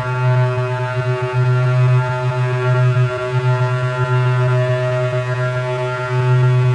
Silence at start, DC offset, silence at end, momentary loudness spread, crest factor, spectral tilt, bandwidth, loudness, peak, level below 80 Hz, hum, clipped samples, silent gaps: 0 s; under 0.1%; 0 s; 5 LU; 10 dB; -8 dB/octave; 8.4 kHz; -17 LUFS; -6 dBFS; -50 dBFS; none; under 0.1%; none